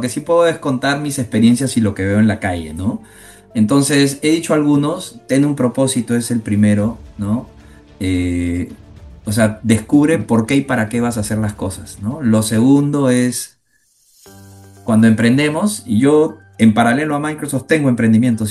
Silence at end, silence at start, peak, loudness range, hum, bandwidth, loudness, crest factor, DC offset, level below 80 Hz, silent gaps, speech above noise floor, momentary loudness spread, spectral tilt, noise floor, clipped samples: 0 s; 0 s; 0 dBFS; 3 LU; none; 12.5 kHz; -15 LUFS; 16 dB; under 0.1%; -44 dBFS; none; 44 dB; 10 LU; -5.5 dB/octave; -59 dBFS; under 0.1%